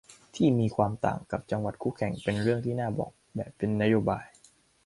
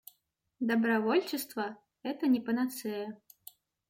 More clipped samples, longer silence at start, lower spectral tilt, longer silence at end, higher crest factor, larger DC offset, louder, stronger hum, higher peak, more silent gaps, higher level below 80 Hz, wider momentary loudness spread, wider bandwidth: neither; second, 0.1 s vs 0.6 s; first, -7.5 dB/octave vs -4.5 dB/octave; second, 0.6 s vs 0.75 s; about the same, 20 dB vs 16 dB; neither; first, -29 LUFS vs -32 LUFS; neither; first, -10 dBFS vs -16 dBFS; neither; first, -56 dBFS vs -80 dBFS; second, 11 LU vs 15 LU; second, 11.5 kHz vs 16.5 kHz